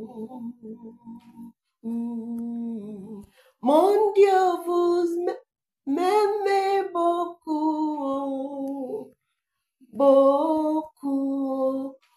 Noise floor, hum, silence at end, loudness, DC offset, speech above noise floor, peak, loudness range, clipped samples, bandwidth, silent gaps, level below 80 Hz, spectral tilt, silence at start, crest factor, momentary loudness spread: -81 dBFS; none; 0.2 s; -24 LUFS; under 0.1%; 62 dB; -8 dBFS; 7 LU; under 0.1%; 14.5 kHz; none; -72 dBFS; -5.5 dB/octave; 0 s; 16 dB; 21 LU